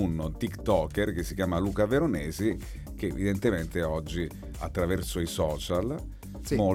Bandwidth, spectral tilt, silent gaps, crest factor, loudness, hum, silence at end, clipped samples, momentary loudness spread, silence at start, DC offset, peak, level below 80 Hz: 17 kHz; -6 dB/octave; none; 18 dB; -30 LUFS; none; 0 s; under 0.1%; 10 LU; 0 s; under 0.1%; -12 dBFS; -40 dBFS